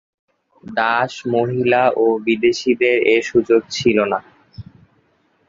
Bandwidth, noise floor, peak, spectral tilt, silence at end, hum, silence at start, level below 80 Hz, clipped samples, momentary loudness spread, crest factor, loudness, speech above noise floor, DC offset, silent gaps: 7.6 kHz; -60 dBFS; 0 dBFS; -5 dB/octave; 0.85 s; none; 0.65 s; -54 dBFS; under 0.1%; 5 LU; 18 dB; -17 LUFS; 44 dB; under 0.1%; none